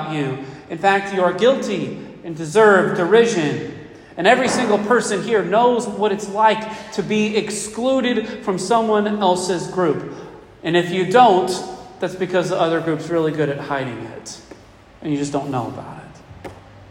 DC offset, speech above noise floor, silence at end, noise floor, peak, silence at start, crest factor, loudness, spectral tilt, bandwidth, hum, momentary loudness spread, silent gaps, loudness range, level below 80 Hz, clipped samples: under 0.1%; 27 dB; 0.05 s; -45 dBFS; 0 dBFS; 0 s; 18 dB; -18 LUFS; -5 dB/octave; 16 kHz; none; 18 LU; none; 6 LU; -56 dBFS; under 0.1%